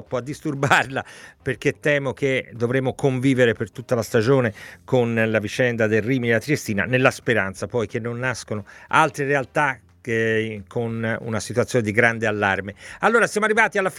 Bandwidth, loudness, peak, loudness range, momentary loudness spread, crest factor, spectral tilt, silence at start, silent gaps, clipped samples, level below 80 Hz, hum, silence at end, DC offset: 16 kHz; -21 LUFS; 0 dBFS; 2 LU; 10 LU; 22 dB; -5.5 dB/octave; 0 s; none; under 0.1%; -56 dBFS; none; 0 s; under 0.1%